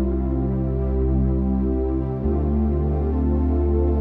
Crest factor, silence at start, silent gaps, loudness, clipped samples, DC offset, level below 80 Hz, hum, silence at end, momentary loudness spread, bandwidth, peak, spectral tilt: 10 dB; 0 s; none; -22 LUFS; under 0.1%; under 0.1%; -24 dBFS; none; 0 s; 3 LU; 2.5 kHz; -10 dBFS; -13 dB/octave